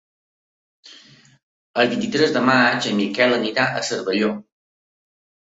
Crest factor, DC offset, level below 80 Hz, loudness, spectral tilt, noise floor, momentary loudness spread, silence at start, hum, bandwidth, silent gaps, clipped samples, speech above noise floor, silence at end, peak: 20 dB; under 0.1%; -64 dBFS; -19 LUFS; -4 dB/octave; -49 dBFS; 8 LU; 0.85 s; none; 8 kHz; 1.43-1.74 s; under 0.1%; 30 dB; 1.2 s; -2 dBFS